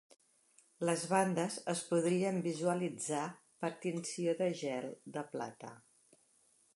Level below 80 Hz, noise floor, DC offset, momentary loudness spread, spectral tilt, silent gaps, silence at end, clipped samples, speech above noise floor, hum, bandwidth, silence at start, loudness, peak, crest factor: -86 dBFS; -71 dBFS; under 0.1%; 12 LU; -5 dB/octave; none; 0.95 s; under 0.1%; 35 dB; none; 11.5 kHz; 0.8 s; -37 LUFS; -16 dBFS; 22 dB